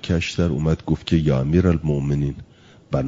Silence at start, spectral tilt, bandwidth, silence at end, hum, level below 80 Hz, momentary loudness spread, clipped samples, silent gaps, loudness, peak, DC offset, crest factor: 0.05 s; -7.5 dB/octave; 7.8 kHz; 0 s; none; -38 dBFS; 8 LU; under 0.1%; none; -21 LUFS; -4 dBFS; under 0.1%; 16 dB